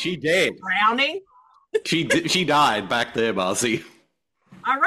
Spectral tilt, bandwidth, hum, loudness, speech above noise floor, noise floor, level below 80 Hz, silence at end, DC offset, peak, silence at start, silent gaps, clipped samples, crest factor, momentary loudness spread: -3 dB/octave; 15 kHz; none; -21 LUFS; 46 dB; -68 dBFS; -60 dBFS; 0 s; under 0.1%; -6 dBFS; 0 s; none; under 0.1%; 16 dB; 10 LU